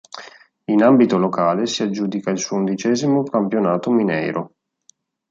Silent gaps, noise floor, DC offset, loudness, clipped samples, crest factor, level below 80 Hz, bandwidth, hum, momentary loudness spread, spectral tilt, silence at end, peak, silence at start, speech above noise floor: none; -58 dBFS; under 0.1%; -18 LUFS; under 0.1%; 16 dB; -66 dBFS; 7.8 kHz; none; 13 LU; -5.5 dB/octave; 0.85 s; -4 dBFS; 0.15 s; 40 dB